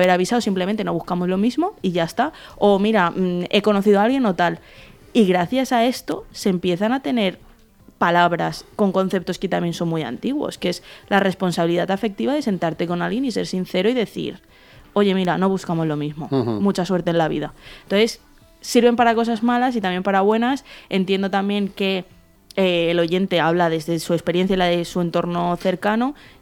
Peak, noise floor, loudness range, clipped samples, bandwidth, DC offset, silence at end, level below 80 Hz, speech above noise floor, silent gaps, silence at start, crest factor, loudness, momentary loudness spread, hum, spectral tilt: -2 dBFS; -50 dBFS; 3 LU; under 0.1%; 17 kHz; under 0.1%; 0.3 s; -52 dBFS; 30 dB; none; 0 s; 18 dB; -20 LUFS; 7 LU; none; -6 dB/octave